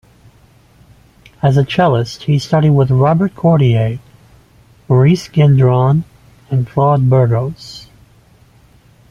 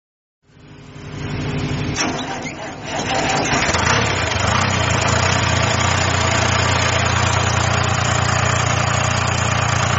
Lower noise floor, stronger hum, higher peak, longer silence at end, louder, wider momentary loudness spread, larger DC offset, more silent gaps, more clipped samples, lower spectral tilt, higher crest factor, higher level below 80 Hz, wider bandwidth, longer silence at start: first, -47 dBFS vs -41 dBFS; neither; about the same, 0 dBFS vs -2 dBFS; first, 1.3 s vs 0 s; first, -13 LUFS vs -17 LUFS; about the same, 10 LU vs 9 LU; neither; neither; neither; first, -8 dB/octave vs -3.5 dB/octave; about the same, 14 dB vs 16 dB; second, -44 dBFS vs -36 dBFS; second, 7.2 kHz vs 8.2 kHz; first, 1.45 s vs 0.65 s